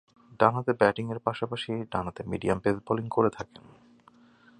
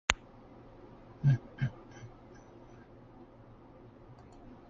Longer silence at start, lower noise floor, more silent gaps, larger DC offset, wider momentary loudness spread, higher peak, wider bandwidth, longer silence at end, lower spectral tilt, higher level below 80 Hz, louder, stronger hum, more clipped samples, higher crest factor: first, 0.3 s vs 0.1 s; about the same, -58 dBFS vs -55 dBFS; neither; neither; second, 9 LU vs 25 LU; about the same, -4 dBFS vs -2 dBFS; first, 11 kHz vs 7.2 kHz; first, 1.15 s vs 0.15 s; first, -7 dB/octave vs -4.5 dB/octave; about the same, -56 dBFS vs -56 dBFS; first, -28 LUFS vs -33 LUFS; neither; neither; second, 26 dB vs 36 dB